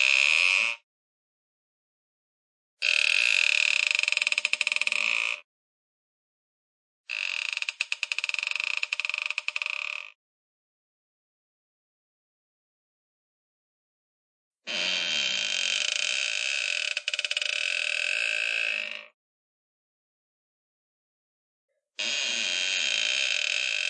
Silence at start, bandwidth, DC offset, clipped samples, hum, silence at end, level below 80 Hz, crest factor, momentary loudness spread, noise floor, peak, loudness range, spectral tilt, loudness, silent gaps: 0 s; 11.5 kHz; under 0.1%; under 0.1%; none; 0 s; under -90 dBFS; 24 dB; 10 LU; under -90 dBFS; -6 dBFS; 11 LU; 3 dB/octave; -25 LUFS; 0.83-2.77 s, 5.44-7.04 s, 10.15-14.51 s, 19.14-21.68 s